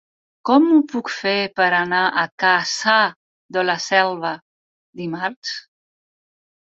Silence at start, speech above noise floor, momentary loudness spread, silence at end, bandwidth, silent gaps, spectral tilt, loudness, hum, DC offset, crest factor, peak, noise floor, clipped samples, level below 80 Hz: 0.45 s; over 71 dB; 13 LU; 1.05 s; 7.8 kHz; 2.32-2.38 s, 3.16-3.49 s, 4.42-4.93 s, 5.36-5.42 s; -3.5 dB/octave; -18 LUFS; none; under 0.1%; 20 dB; -2 dBFS; under -90 dBFS; under 0.1%; -68 dBFS